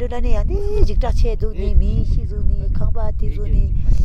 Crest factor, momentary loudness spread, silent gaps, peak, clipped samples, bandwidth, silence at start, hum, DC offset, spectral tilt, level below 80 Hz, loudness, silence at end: 14 dB; 4 LU; none; 0 dBFS; under 0.1%; 6.2 kHz; 0 s; none; under 0.1%; -8.5 dB/octave; -16 dBFS; -22 LUFS; 0 s